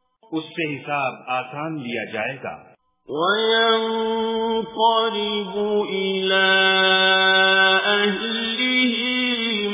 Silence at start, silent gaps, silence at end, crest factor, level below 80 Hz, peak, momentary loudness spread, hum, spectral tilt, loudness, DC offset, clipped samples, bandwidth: 0.3 s; none; 0 s; 16 dB; -64 dBFS; -6 dBFS; 13 LU; none; -7.5 dB/octave; -19 LUFS; under 0.1%; under 0.1%; 3.9 kHz